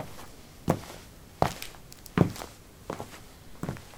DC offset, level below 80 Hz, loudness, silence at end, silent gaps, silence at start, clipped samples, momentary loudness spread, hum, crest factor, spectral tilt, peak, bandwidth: under 0.1%; -52 dBFS; -33 LUFS; 0 s; none; 0 s; under 0.1%; 20 LU; none; 30 dB; -6 dB/octave; -4 dBFS; 18 kHz